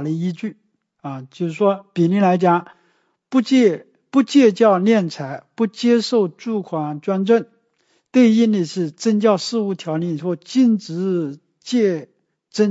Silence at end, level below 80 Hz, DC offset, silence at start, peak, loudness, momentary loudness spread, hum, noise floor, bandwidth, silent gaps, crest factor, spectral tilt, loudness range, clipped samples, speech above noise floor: 0 s; -74 dBFS; under 0.1%; 0 s; -2 dBFS; -18 LUFS; 15 LU; none; -64 dBFS; 8 kHz; none; 16 dB; -6.5 dB/octave; 4 LU; under 0.1%; 47 dB